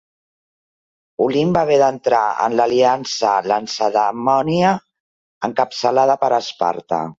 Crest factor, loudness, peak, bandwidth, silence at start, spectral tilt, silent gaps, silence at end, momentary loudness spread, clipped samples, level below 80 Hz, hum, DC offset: 16 dB; -17 LUFS; -2 dBFS; 7.8 kHz; 1.2 s; -5 dB/octave; 5.00-5.41 s; 0.05 s; 6 LU; under 0.1%; -58 dBFS; none; under 0.1%